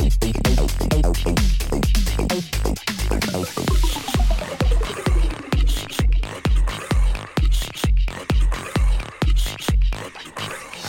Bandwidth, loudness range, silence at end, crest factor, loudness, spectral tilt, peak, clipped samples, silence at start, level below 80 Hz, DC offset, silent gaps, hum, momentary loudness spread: 17 kHz; 1 LU; 0 s; 14 dB; -22 LUFS; -5 dB/octave; -4 dBFS; under 0.1%; 0 s; -20 dBFS; under 0.1%; none; none; 3 LU